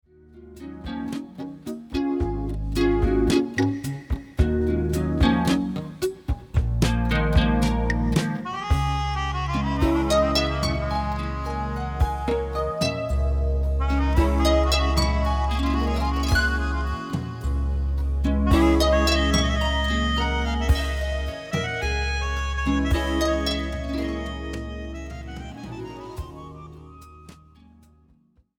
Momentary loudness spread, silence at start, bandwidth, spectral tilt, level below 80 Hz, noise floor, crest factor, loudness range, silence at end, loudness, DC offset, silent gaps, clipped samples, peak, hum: 14 LU; 0.35 s; 16.5 kHz; -6 dB/octave; -26 dBFS; -60 dBFS; 18 dB; 7 LU; 1.25 s; -24 LUFS; under 0.1%; none; under 0.1%; -6 dBFS; none